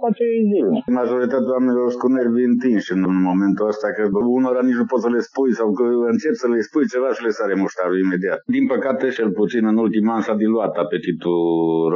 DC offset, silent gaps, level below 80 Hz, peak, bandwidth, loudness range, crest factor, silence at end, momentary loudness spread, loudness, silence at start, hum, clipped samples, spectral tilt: under 0.1%; none; -64 dBFS; -4 dBFS; 7.2 kHz; 1 LU; 14 dB; 0 s; 3 LU; -19 LUFS; 0 s; none; under 0.1%; -6.5 dB/octave